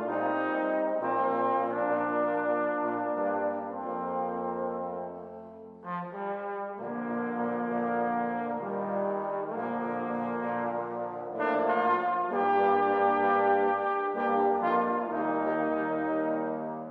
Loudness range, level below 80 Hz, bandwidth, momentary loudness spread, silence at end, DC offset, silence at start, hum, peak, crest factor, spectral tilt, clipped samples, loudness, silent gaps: 8 LU; -76 dBFS; 5 kHz; 10 LU; 0 s; under 0.1%; 0 s; none; -14 dBFS; 16 dB; -8.5 dB/octave; under 0.1%; -30 LUFS; none